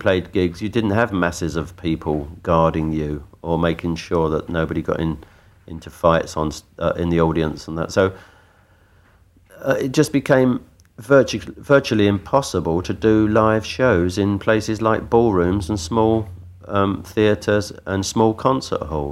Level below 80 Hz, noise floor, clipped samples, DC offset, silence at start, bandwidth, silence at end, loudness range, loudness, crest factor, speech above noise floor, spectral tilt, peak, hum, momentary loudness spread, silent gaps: -40 dBFS; -53 dBFS; under 0.1%; under 0.1%; 0 s; 15 kHz; 0 s; 5 LU; -20 LUFS; 18 dB; 35 dB; -6 dB/octave; -2 dBFS; none; 9 LU; none